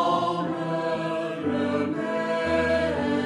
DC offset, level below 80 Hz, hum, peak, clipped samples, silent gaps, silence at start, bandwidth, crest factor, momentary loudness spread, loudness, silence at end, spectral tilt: under 0.1%; -52 dBFS; none; -10 dBFS; under 0.1%; none; 0 s; 11 kHz; 14 dB; 5 LU; -26 LUFS; 0 s; -6.5 dB/octave